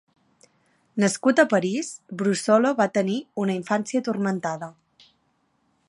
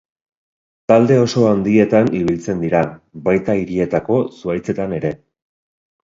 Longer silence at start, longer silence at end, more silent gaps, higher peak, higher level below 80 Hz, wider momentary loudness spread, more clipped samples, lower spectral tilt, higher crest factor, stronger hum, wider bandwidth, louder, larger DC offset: about the same, 0.95 s vs 0.9 s; first, 1.15 s vs 0.9 s; neither; second, -4 dBFS vs 0 dBFS; second, -74 dBFS vs -48 dBFS; about the same, 11 LU vs 10 LU; neither; second, -5 dB/octave vs -7.5 dB/octave; about the same, 20 dB vs 16 dB; neither; first, 11.5 kHz vs 7.8 kHz; second, -23 LUFS vs -17 LUFS; neither